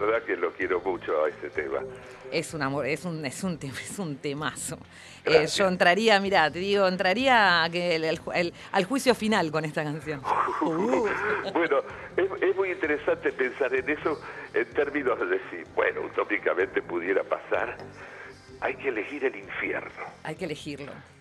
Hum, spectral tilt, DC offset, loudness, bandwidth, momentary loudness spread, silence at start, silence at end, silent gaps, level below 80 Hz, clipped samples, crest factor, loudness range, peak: none; -4.5 dB/octave; under 0.1%; -27 LUFS; 13 kHz; 14 LU; 0 s; 0.2 s; none; -60 dBFS; under 0.1%; 20 dB; 9 LU; -6 dBFS